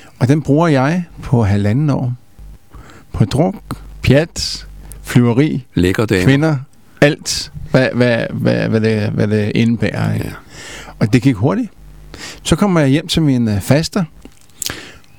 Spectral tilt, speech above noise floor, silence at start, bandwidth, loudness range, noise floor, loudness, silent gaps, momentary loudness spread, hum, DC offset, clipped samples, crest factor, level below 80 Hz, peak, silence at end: -6 dB/octave; 25 dB; 0.2 s; 18.5 kHz; 3 LU; -39 dBFS; -15 LUFS; none; 15 LU; none; 0.7%; under 0.1%; 16 dB; -38 dBFS; 0 dBFS; 0.25 s